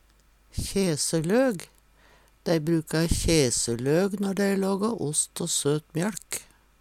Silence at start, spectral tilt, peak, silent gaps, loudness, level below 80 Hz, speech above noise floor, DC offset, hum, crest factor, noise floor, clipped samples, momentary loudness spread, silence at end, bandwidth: 0.55 s; -4.5 dB/octave; -8 dBFS; none; -26 LUFS; -42 dBFS; 35 dB; under 0.1%; none; 18 dB; -60 dBFS; under 0.1%; 12 LU; 0.4 s; 16.5 kHz